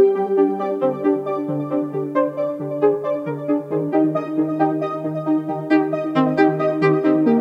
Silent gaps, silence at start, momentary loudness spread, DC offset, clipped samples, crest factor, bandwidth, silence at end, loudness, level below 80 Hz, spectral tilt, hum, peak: none; 0 s; 7 LU; under 0.1%; under 0.1%; 14 dB; 5.8 kHz; 0 s; -20 LUFS; -70 dBFS; -9 dB/octave; none; -4 dBFS